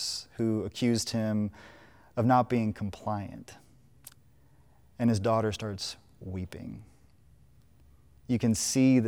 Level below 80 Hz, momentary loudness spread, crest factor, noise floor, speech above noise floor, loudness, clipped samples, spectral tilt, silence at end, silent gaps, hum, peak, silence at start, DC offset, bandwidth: -62 dBFS; 18 LU; 18 dB; -61 dBFS; 33 dB; -30 LUFS; under 0.1%; -5.5 dB/octave; 0 s; none; none; -12 dBFS; 0 s; under 0.1%; 17.5 kHz